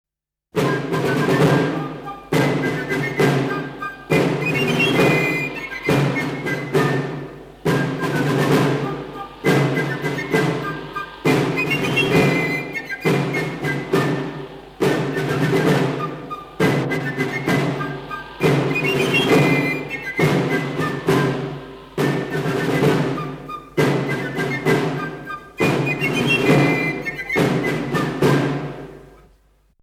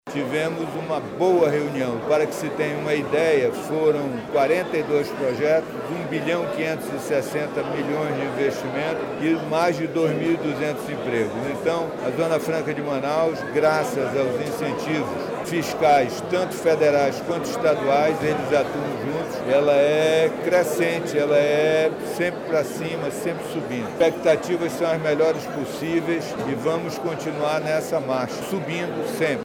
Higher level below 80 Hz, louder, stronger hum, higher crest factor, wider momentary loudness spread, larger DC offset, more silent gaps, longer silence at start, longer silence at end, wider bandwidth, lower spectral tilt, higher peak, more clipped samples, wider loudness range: first, -50 dBFS vs -58 dBFS; first, -20 LUFS vs -23 LUFS; neither; about the same, 16 dB vs 14 dB; first, 12 LU vs 8 LU; neither; neither; first, 0.55 s vs 0.05 s; first, 0.75 s vs 0 s; about the same, 16 kHz vs 17.5 kHz; about the same, -6 dB/octave vs -5.5 dB/octave; first, -4 dBFS vs -8 dBFS; neither; about the same, 3 LU vs 4 LU